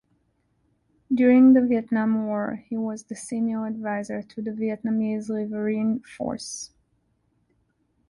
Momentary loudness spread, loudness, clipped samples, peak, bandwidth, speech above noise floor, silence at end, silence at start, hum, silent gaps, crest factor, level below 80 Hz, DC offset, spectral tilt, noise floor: 16 LU; -24 LUFS; under 0.1%; -8 dBFS; 11.5 kHz; 46 dB; 1.45 s; 1.1 s; none; none; 16 dB; -64 dBFS; under 0.1%; -6 dB/octave; -69 dBFS